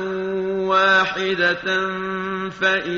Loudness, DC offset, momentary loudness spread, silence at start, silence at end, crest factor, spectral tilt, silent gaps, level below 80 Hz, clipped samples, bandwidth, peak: -20 LUFS; under 0.1%; 10 LU; 0 s; 0 s; 14 dB; -1.5 dB/octave; none; -56 dBFS; under 0.1%; 7.4 kHz; -6 dBFS